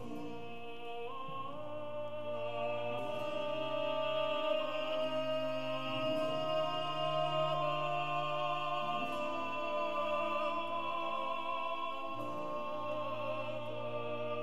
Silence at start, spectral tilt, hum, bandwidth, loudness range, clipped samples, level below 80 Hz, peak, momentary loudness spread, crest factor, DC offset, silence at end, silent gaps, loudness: 0 s; -5.5 dB/octave; none; 13.5 kHz; 4 LU; under 0.1%; -76 dBFS; -22 dBFS; 9 LU; 14 dB; 0.7%; 0 s; none; -37 LUFS